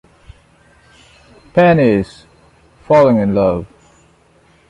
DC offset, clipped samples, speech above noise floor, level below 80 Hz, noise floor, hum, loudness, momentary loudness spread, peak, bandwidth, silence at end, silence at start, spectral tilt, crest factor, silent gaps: under 0.1%; under 0.1%; 40 dB; -44 dBFS; -51 dBFS; none; -13 LUFS; 10 LU; -2 dBFS; 10.5 kHz; 1.05 s; 1.55 s; -8.5 dB/octave; 16 dB; none